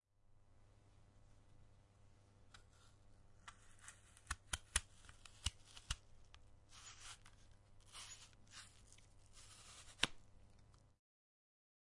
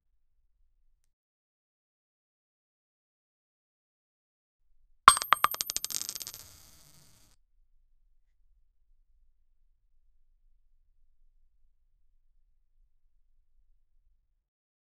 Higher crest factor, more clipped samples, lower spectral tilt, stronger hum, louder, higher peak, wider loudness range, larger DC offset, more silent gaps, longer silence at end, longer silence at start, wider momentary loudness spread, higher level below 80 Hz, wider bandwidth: about the same, 38 dB vs 36 dB; neither; first, -1 dB/octave vs 0.5 dB/octave; neither; second, -48 LUFS vs -25 LUFS; second, -16 dBFS vs 0 dBFS; about the same, 14 LU vs 13 LU; neither; neither; second, 1.05 s vs 8.7 s; second, 0.2 s vs 5.05 s; first, 27 LU vs 18 LU; about the same, -62 dBFS vs -64 dBFS; second, 11.5 kHz vs 15.5 kHz